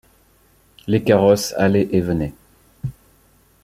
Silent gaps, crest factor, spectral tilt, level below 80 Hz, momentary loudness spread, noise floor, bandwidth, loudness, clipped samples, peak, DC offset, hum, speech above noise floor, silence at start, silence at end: none; 18 dB; -6 dB/octave; -46 dBFS; 18 LU; -56 dBFS; 16 kHz; -18 LUFS; under 0.1%; -2 dBFS; under 0.1%; none; 39 dB; 0.85 s; 0.7 s